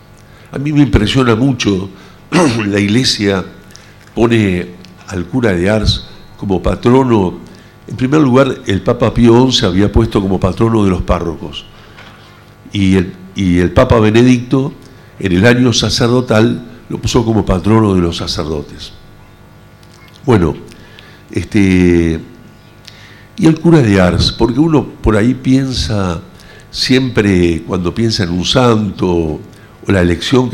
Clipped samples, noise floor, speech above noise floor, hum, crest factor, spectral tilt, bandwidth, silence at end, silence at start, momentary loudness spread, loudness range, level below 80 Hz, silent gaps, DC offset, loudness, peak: under 0.1%; -39 dBFS; 28 dB; 50 Hz at -40 dBFS; 12 dB; -6 dB/octave; 14.5 kHz; 0 s; 0.5 s; 14 LU; 4 LU; -30 dBFS; none; under 0.1%; -12 LUFS; 0 dBFS